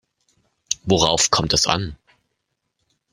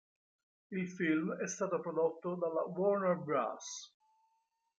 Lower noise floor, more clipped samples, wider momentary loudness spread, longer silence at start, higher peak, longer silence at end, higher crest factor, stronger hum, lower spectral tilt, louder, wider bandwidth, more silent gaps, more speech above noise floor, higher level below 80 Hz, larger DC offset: second, -76 dBFS vs -81 dBFS; neither; about the same, 11 LU vs 11 LU; about the same, 0.7 s vs 0.7 s; first, 0 dBFS vs -20 dBFS; first, 1.2 s vs 0.9 s; about the same, 22 dB vs 18 dB; neither; second, -3 dB/octave vs -5.5 dB/octave; first, -18 LUFS vs -36 LUFS; first, 16 kHz vs 9 kHz; neither; first, 57 dB vs 45 dB; first, -44 dBFS vs -84 dBFS; neither